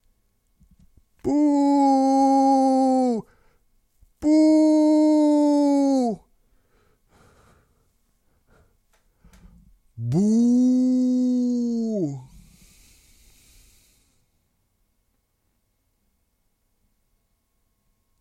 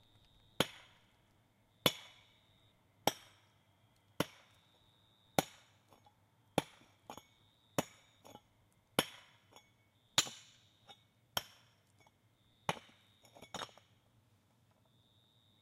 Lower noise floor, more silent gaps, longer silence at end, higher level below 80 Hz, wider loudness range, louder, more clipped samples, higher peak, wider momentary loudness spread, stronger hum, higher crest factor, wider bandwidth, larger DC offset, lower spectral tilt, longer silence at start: about the same, -71 dBFS vs -72 dBFS; neither; first, 5.95 s vs 1.95 s; first, -60 dBFS vs -74 dBFS; first, 11 LU vs 8 LU; first, -20 LUFS vs -39 LUFS; neither; about the same, -8 dBFS vs -10 dBFS; second, 10 LU vs 25 LU; neither; second, 14 dB vs 34 dB; second, 11 kHz vs 15.5 kHz; neither; first, -7.5 dB/octave vs -2.5 dB/octave; first, 1.25 s vs 0.6 s